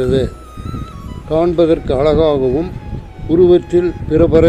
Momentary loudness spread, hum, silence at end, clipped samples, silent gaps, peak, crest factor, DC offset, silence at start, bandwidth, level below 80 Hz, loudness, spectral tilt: 18 LU; none; 0 s; under 0.1%; none; 0 dBFS; 14 dB; 0.2%; 0 s; 9 kHz; -28 dBFS; -14 LUFS; -8.5 dB/octave